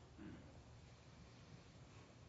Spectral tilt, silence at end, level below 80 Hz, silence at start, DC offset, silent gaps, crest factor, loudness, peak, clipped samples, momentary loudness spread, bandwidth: -5.5 dB/octave; 0 s; -70 dBFS; 0 s; under 0.1%; none; 14 dB; -61 LUFS; -46 dBFS; under 0.1%; 5 LU; 7.6 kHz